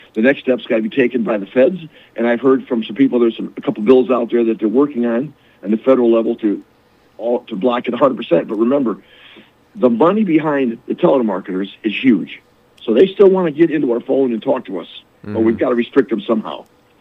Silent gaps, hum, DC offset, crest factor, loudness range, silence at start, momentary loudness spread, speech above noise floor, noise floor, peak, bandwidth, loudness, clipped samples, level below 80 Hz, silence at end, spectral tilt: none; none; under 0.1%; 16 dB; 2 LU; 0.15 s; 13 LU; 29 dB; -45 dBFS; 0 dBFS; 4.4 kHz; -16 LUFS; under 0.1%; -64 dBFS; 0.4 s; -8.5 dB/octave